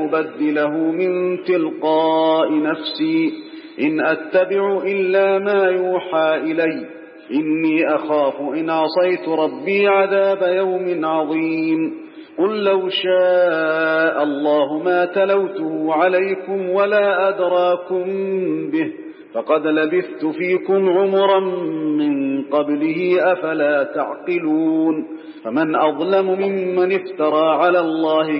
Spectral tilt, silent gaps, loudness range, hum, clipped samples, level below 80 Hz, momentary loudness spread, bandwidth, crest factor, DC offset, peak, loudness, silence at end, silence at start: -10.5 dB/octave; none; 2 LU; none; under 0.1%; -76 dBFS; 7 LU; 5.4 kHz; 14 dB; under 0.1%; -4 dBFS; -18 LUFS; 0 s; 0 s